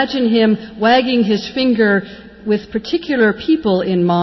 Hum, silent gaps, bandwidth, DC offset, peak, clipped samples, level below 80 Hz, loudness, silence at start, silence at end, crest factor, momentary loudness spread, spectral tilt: none; none; 6 kHz; under 0.1%; -2 dBFS; under 0.1%; -48 dBFS; -15 LUFS; 0 s; 0 s; 12 dB; 7 LU; -7 dB/octave